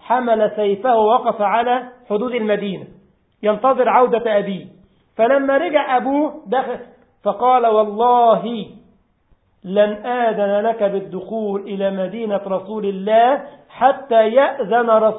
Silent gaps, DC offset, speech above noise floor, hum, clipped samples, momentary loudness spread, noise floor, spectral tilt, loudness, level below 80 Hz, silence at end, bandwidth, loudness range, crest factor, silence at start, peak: none; under 0.1%; 42 dB; none; under 0.1%; 11 LU; -58 dBFS; -10.5 dB/octave; -17 LUFS; -62 dBFS; 0 s; 4 kHz; 3 LU; 16 dB; 0.05 s; 0 dBFS